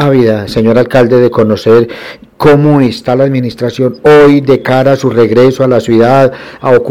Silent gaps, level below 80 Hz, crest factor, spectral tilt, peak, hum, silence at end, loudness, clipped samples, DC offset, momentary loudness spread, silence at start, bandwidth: none; -40 dBFS; 8 dB; -7.5 dB/octave; 0 dBFS; none; 0 s; -8 LUFS; 1%; 1%; 7 LU; 0 s; 15.5 kHz